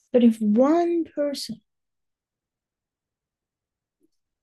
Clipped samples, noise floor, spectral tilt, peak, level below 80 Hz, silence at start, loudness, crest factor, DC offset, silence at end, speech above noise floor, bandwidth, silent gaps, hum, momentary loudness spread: under 0.1%; -88 dBFS; -6.5 dB/octave; -8 dBFS; -74 dBFS; 0.15 s; -21 LUFS; 18 dB; under 0.1%; 2.9 s; 67 dB; 12.5 kHz; none; none; 15 LU